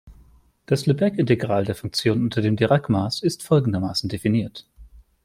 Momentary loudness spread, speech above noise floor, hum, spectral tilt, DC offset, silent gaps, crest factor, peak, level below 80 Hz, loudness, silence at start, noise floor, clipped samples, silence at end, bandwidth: 5 LU; 33 dB; none; -6.5 dB/octave; under 0.1%; none; 18 dB; -4 dBFS; -52 dBFS; -22 LUFS; 0.05 s; -54 dBFS; under 0.1%; 0.25 s; 15.5 kHz